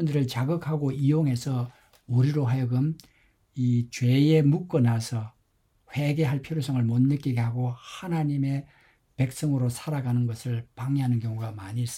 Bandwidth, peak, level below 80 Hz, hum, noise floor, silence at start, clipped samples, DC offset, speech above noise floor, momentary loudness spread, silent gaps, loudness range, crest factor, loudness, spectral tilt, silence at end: 15 kHz; -10 dBFS; -60 dBFS; none; -68 dBFS; 0 s; under 0.1%; under 0.1%; 43 dB; 9 LU; none; 4 LU; 16 dB; -26 LUFS; -7.5 dB/octave; 0 s